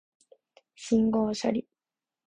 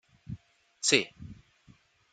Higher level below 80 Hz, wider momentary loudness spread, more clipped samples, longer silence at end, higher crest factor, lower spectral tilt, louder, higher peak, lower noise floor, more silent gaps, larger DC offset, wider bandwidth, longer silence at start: about the same, -64 dBFS vs -62 dBFS; second, 10 LU vs 24 LU; neither; about the same, 0.7 s vs 0.8 s; second, 18 dB vs 30 dB; first, -6 dB/octave vs -2 dB/octave; about the same, -27 LUFS vs -27 LUFS; second, -12 dBFS vs -6 dBFS; first, under -90 dBFS vs -62 dBFS; neither; neither; about the same, 9.6 kHz vs 9.4 kHz; first, 0.8 s vs 0.3 s